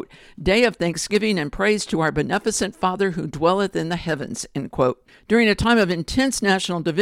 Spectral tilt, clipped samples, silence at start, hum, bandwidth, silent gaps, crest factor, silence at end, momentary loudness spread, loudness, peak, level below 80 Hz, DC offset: -4.5 dB/octave; under 0.1%; 0 s; none; 16 kHz; none; 18 dB; 0 s; 9 LU; -21 LUFS; -4 dBFS; -42 dBFS; under 0.1%